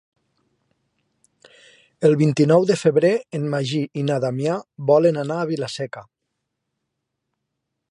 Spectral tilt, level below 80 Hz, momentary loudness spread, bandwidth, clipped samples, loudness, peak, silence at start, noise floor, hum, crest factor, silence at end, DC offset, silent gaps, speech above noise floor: -7 dB/octave; -68 dBFS; 10 LU; 11 kHz; under 0.1%; -20 LUFS; -4 dBFS; 2 s; -79 dBFS; none; 18 dB; 1.9 s; under 0.1%; none; 60 dB